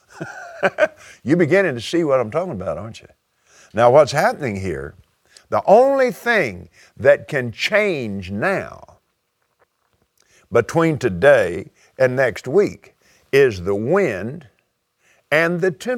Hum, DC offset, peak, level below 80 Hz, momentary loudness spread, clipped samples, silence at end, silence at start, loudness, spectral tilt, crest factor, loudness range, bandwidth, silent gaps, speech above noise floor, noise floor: none; under 0.1%; 0 dBFS; -54 dBFS; 17 LU; under 0.1%; 0 s; 0.15 s; -18 LUFS; -6 dB/octave; 20 dB; 4 LU; 15.5 kHz; none; 52 dB; -69 dBFS